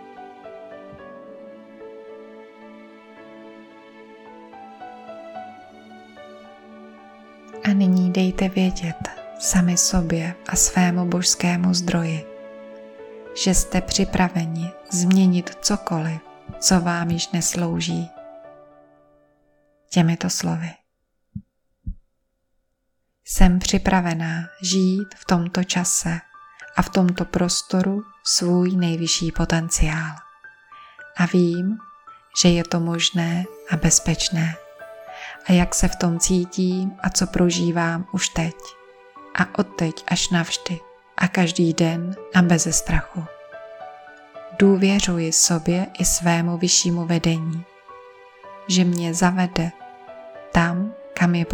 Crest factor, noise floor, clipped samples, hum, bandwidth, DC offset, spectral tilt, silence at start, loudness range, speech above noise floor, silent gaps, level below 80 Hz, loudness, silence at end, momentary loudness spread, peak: 22 dB; -72 dBFS; under 0.1%; none; 18 kHz; under 0.1%; -4 dB/octave; 0 s; 7 LU; 52 dB; none; -34 dBFS; -20 LUFS; 0 s; 23 LU; 0 dBFS